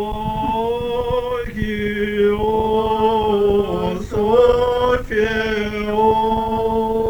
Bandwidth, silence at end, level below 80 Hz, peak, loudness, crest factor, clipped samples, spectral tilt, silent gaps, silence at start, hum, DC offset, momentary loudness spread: over 20 kHz; 0 s; -34 dBFS; -2 dBFS; -18 LUFS; 16 dB; under 0.1%; -6.5 dB/octave; none; 0 s; none; under 0.1%; 7 LU